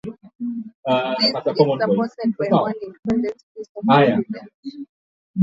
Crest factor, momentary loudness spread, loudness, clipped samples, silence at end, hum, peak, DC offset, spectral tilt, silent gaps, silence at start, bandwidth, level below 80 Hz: 18 dB; 20 LU; -20 LUFS; under 0.1%; 0 s; none; -2 dBFS; under 0.1%; -7.5 dB/octave; 0.35-0.39 s, 0.74-0.83 s, 2.99-3.03 s, 3.43-3.55 s, 3.69-3.75 s, 4.54-4.63 s, 4.89-5.34 s; 0.05 s; 7.6 kHz; -58 dBFS